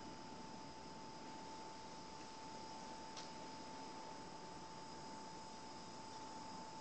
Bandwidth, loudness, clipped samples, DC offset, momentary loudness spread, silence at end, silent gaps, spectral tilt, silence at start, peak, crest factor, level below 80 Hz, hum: 8.8 kHz; -53 LUFS; under 0.1%; under 0.1%; 2 LU; 0 s; none; -3.5 dB/octave; 0 s; -34 dBFS; 18 dB; -74 dBFS; none